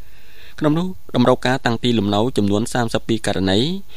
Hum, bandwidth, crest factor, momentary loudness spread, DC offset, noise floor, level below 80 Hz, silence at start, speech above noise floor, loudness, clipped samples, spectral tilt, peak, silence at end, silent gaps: none; 15.5 kHz; 18 dB; 5 LU; 4%; -45 dBFS; -46 dBFS; 0.6 s; 26 dB; -19 LUFS; under 0.1%; -5.5 dB/octave; -2 dBFS; 0.15 s; none